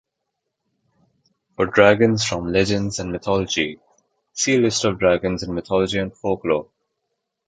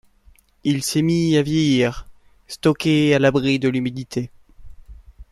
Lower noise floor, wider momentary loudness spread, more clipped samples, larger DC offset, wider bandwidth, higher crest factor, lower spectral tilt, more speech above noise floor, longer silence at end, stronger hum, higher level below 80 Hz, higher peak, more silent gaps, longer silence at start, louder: first, -79 dBFS vs -53 dBFS; about the same, 10 LU vs 12 LU; neither; neither; second, 9.4 kHz vs 14 kHz; about the same, 20 dB vs 18 dB; about the same, -4.5 dB/octave vs -5.5 dB/octave; first, 59 dB vs 35 dB; first, 0.85 s vs 0.1 s; neither; about the same, -46 dBFS vs -46 dBFS; about the same, -2 dBFS vs -4 dBFS; neither; first, 1.6 s vs 0.65 s; about the same, -20 LUFS vs -19 LUFS